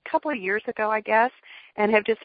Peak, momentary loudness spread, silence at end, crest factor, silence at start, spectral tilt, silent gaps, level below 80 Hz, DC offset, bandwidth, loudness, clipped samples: -6 dBFS; 5 LU; 0 s; 20 dB; 0.05 s; -9.5 dB/octave; none; -68 dBFS; under 0.1%; 5 kHz; -24 LUFS; under 0.1%